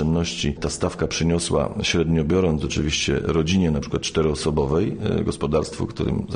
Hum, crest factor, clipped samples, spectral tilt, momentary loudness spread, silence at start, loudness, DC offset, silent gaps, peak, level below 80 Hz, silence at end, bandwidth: none; 14 dB; under 0.1%; -5 dB/octave; 5 LU; 0 s; -22 LUFS; under 0.1%; none; -8 dBFS; -36 dBFS; 0 s; 10 kHz